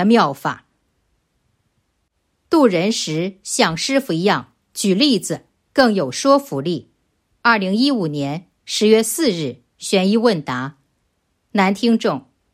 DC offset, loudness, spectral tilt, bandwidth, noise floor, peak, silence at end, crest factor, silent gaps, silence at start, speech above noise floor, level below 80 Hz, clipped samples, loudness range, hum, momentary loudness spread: under 0.1%; -18 LUFS; -4.5 dB/octave; 16 kHz; -69 dBFS; -2 dBFS; 0.35 s; 18 dB; none; 0 s; 52 dB; -60 dBFS; under 0.1%; 2 LU; none; 12 LU